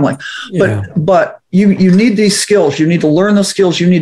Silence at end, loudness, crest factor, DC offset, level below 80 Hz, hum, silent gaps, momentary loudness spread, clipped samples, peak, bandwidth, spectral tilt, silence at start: 0 s; -11 LUFS; 10 dB; under 0.1%; -50 dBFS; none; none; 6 LU; under 0.1%; 0 dBFS; 14.5 kHz; -5.5 dB/octave; 0 s